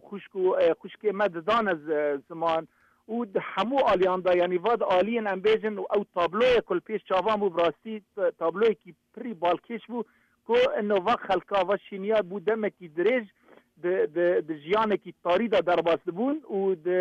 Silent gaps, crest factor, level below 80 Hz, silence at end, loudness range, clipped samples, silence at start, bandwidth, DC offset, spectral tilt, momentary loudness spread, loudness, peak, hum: none; 12 dB; -62 dBFS; 0 s; 3 LU; under 0.1%; 0.1 s; 7.8 kHz; under 0.1%; -6.5 dB/octave; 8 LU; -26 LUFS; -14 dBFS; none